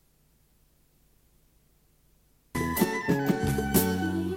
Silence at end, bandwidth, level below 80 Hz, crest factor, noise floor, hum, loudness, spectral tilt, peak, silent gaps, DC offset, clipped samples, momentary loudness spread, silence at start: 0 s; 16.5 kHz; -48 dBFS; 20 dB; -65 dBFS; none; -27 LUFS; -5.5 dB/octave; -10 dBFS; none; under 0.1%; under 0.1%; 6 LU; 2.55 s